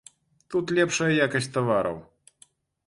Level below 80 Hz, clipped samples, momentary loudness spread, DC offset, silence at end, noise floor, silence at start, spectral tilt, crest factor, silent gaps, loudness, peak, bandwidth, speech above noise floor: -62 dBFS; under 0.1%; 9 LU; under 0.1%; 0.85 s; -60 dBFS; 0.5 s; -4.5 dB/octave; 18 dB; none; -25 LUFS; -10 dBFS; 11.5 kHz; 36 dB